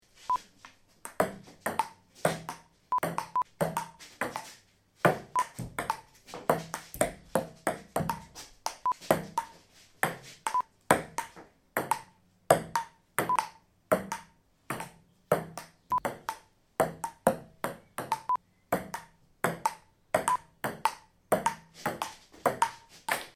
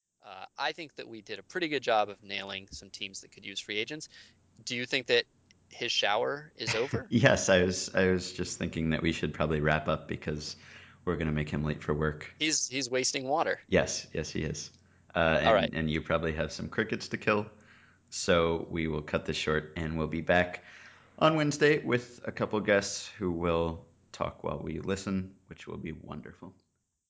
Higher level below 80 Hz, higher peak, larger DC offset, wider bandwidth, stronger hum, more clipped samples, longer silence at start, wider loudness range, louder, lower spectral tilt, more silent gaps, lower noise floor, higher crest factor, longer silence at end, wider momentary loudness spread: second, -62 dBFS vs -50 dBFS; first, -4 dBFS vs -8 dBFS; neither; first, 17 kHz vs 8 kHz; neither; neither; about the same, 0.2 s vs 0.25 s; second, 3 LU vs 6 LU; second, -33 LUFS vs -30 LUFS; about the same, -4 dB/octave vs -4 dB/octave; neither; about the same, -62 dBFS vs -60 dBFS; about the same, 28 dB vs 24 dB; second, 0.05 s vs 0.6 s; second, 13 LU vs 17 LU